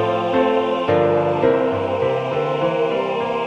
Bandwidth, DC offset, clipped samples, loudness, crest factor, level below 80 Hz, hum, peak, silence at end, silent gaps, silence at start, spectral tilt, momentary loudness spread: 8 kHz; under 0.1%; under 0.1%; -19 LUFS; 14 dB; -54 dBFS; none; -4 dBFS; 0 s; none; 0 s; -7.5 dB/octave; 4 LU